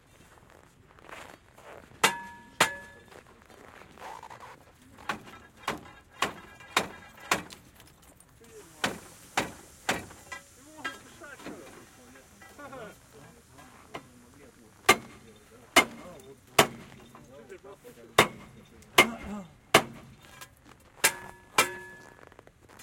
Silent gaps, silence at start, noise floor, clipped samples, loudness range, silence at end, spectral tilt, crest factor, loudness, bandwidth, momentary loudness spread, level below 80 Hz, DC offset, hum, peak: none; 1.1 s; -57 dBFS; under 0.1%; 15 LU; 0 s; -2 dB/octave; 32 dB; -28 LUFS; 16.5 kHz; 26 LU; -62 dBFS; under 0.1%; none; -2 dBFS